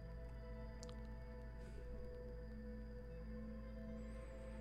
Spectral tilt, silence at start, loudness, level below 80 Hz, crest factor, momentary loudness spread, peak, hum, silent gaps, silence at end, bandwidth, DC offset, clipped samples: -7 dB/octave; 0 s; -54 LUFS; -54 dBFS; 14 dB; 2 LU; -36 dBFS; none; none; 0 s; 9.6 kHz; under 0.1%; under 0.1%